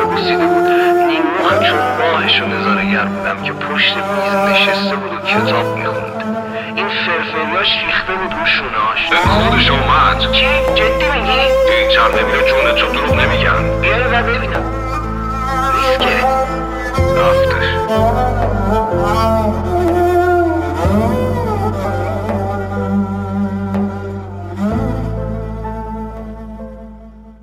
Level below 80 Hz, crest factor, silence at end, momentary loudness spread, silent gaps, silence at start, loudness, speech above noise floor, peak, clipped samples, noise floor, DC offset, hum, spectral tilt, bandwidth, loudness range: -28 dBFS; 14 dB; 0.1 s; 10 LU; none; 0 s; -14 LUFS; 22 dB; 0 dBFS; under 0.1%; -36 dBFS; under 0.1%; none; -5.5 dB/octave; 16 kHz; 8 LU